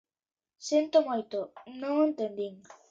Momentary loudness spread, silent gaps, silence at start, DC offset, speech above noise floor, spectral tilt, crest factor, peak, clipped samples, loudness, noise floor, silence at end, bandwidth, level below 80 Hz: 14 LU; none; 0.6 s; under 0.1%; over 60 dB; -4.5 dB/octave; 18 dB; -12 dBFS; under 0.1%; -30 LUFS; under -90 dBFS; 0.2 s; 7.8 kHz; -82 dBFS